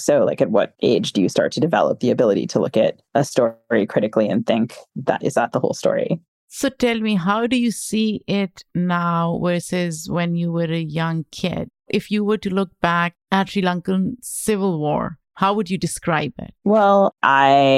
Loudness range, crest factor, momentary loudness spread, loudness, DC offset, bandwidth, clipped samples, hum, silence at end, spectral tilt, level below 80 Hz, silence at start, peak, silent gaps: 3 LU; 18 dB; 8 LU; -20 LUFS; under 0.1%; 14.5 kHz; under 0.1%; none; 0 s; -5.5 dB/octave; -54 dBFS; 0 s; 0 dBFS; 6.28-6.48 s